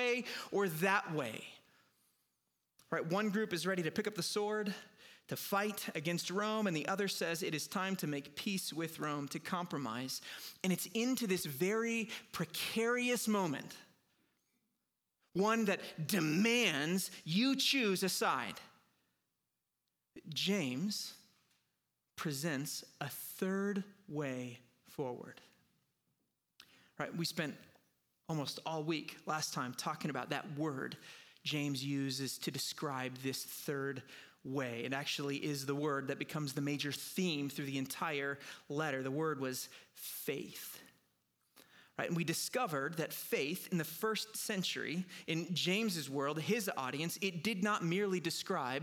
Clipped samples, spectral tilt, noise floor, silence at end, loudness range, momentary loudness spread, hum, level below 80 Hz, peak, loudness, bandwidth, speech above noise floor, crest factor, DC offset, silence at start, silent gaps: under 0.1%; -4 dB/octave; -88 dBFS; 0 s; 6 LU; 10 LU; none; -84 dBFS; -18 dBFS; -38 LUFS; 19.5 kHz; 50 dB; 20 dB; under 0.1%; 0 s; none